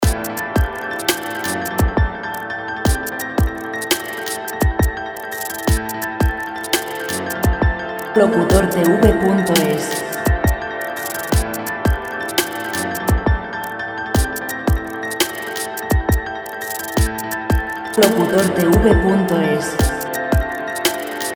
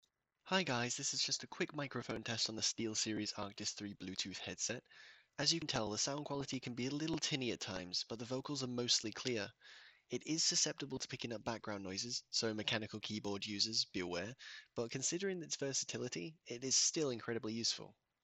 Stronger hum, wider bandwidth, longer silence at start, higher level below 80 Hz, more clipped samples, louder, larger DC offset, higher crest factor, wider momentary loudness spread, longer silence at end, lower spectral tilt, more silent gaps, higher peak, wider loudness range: neither; first, over 20 kHz vs 8.6 kHz; second, 0 s vs 0.45 s; first, -26 dBFS vs -74 dBFS; neither; first, -19 LUFS vs -39 LUFS; neither; about the same, 18 dB vs 22 dB; about the same, 10 LU vs 10 LU; second, 0 s vs 0.35 s; first, -5 dB/octave vs -2.5 dB/octave; neither; first, 0 dBFS vs -20 dBFS; first, 5 LU vs 2 LU